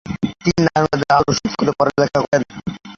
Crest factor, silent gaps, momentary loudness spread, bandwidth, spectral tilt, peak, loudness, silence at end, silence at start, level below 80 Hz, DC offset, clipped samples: 18 dB; 2.28-2.32 s; 7 LU; 7.6 kHz; -5.5 dB/octave; 0 dBFS; -17 LUFS; 0 s; 0.05 s; -44 dBFS; under 0.1%; under 0.1%